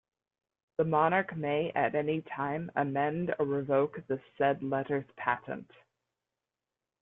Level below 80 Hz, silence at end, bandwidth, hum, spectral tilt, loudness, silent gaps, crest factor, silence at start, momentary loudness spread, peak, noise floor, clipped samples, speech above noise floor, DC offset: -70 dBFS; 1.4 s; 3.9 kHz; none; -10 dB/octave; -31 LUFS; none; 20 dB; 0.8 s; 8 LU; -12 dBFS; under -90 dBFS; under 0.1%; over 59 dB; under 0.1%